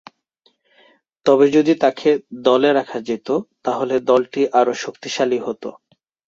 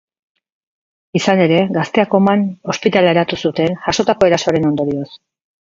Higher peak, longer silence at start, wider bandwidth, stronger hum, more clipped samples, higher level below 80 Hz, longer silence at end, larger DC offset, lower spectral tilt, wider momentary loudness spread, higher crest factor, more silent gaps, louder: about the same, -2 dBFS vs 0 dBFS; about the same, 1.25 s vs 1.15 s; about the same, 7.8 kHz vs 7.8 kHz; neither; neither; second, -64 dBFS vs -50 dBFS; first, 0.6 s vs 0.45 s; neither; about the same, -5 dB/octave vs -5.5 dB/octave; first, 11 LU vs 7 LU; about the same, 18 dB vs 16 dB; neither; second, -18 LUFS vs -15 LUFS